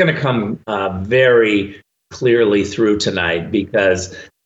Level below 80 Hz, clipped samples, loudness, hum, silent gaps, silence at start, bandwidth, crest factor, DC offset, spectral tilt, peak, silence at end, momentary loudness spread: -54 dBFS; under 0.1%; -16 LUFS; none; none; 0 s; 8.2 kHz; 14 dB; under 0.1%; -5.5 dB/octave; -2 dBFS; 0.2 s; 9 LU